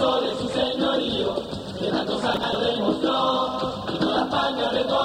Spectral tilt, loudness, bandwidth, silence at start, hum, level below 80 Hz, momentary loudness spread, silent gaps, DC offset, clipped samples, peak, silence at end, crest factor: -5 dB/octave; -24 LUFS; 15.5 kHz; 0 s; none; -50 dBFS; 5 LU; none; under 0.1%; under 0.1%; -8 dBFS; 0 s; 16 dB